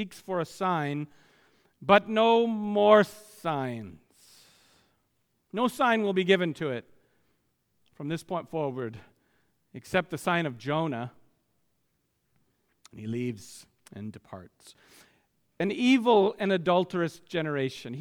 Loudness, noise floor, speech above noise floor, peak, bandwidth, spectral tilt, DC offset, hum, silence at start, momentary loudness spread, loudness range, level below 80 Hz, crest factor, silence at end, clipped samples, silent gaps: -27 LUFS; -75 dBFS; 48 dB; -6 dBFS; 18 kHz; -6 dB/octave; under 0.1%; none; 0 s; 20 LU; 16 LU; -70 dBFS; 24 dB; 0 s; under 0.1%; none